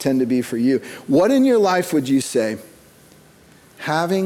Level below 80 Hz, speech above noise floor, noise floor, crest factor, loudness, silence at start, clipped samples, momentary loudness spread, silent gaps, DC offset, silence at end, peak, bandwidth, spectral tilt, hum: -62 dBFS; 31 dB; -49 dBFS; 14 dB; -18 LUFS; 0 s; under 0.1%; 9 LU; none; under 0.1%; 0 s; -6 dBFS; 16 kHz; -5.5 dB/octave; none